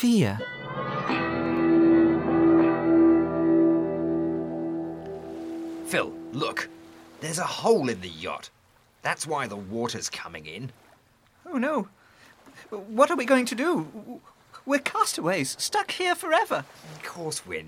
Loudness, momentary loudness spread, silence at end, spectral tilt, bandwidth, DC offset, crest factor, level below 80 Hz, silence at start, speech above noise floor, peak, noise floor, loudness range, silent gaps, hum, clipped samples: -25 LUFS; 17 LU; 0 s; -5 dB/octave; 15.5 kHz; under 0.1%; 20 dB; -62 dBFS; 0 s; 34 dB; -6 dBFS; -61 dBFS; 11 LU; none; none; under 0.1%